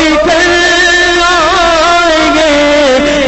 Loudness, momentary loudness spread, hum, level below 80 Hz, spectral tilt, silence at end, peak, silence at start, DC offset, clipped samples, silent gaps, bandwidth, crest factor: -7 LUFS; 1 LU; none; -28 dBFS; -2.5 dB/octave; 0 s; 0 dBFS; 0 s; under 0.1%; under 0.1%; none; 8.4 kHz; 8 dB